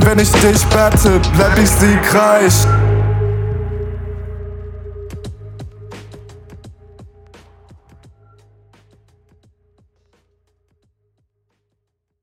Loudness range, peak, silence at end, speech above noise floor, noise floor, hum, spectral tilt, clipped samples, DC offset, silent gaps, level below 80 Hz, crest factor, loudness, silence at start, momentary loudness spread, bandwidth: 24 LU; 0 dBFS; 5.2 s; 62 dB; -73 dBFS; none; -5 dB/octave; under 0.1%; under 0.1%; none; -26 dBFS; 16 dB; -12 LUFS; 0 s; 22 LU; 19 kHz